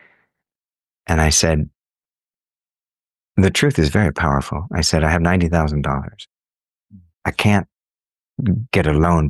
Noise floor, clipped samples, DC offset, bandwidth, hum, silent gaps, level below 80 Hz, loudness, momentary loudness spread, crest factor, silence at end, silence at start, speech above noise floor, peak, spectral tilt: under -90 dBFS; under 0.1%; under 0.1%; 12.5 kHz; none; 2.71-2.75 s, 6.53-6.57 s; -30 dBFS; -18 LUFS; 11 LU; 18 dB; 0 s; 1.1 s; over 73 dB; -2 dBFS; -5 dB/octave